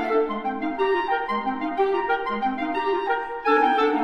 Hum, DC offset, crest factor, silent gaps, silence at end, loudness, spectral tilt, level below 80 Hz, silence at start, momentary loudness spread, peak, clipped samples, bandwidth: none; under 0.1%; 16 dB; none; 0 s; -24 LUFS; -6 dB/octave; -54 dBFS; 0 s; 6 LU; -8 dBFS; under 0.1%; 7 kHz